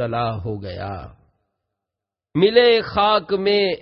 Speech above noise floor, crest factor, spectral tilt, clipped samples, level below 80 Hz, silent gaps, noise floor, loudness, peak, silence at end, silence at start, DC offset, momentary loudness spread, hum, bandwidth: 68 dB; 18 dB; -10 dB/octave; under 0.1%; -46 dBFS; none; -86 dBFS; -18 LUFS; -2 dBFS; 0 s; 0 s; under 0.1%; 16 LU; none; 5.8 kHz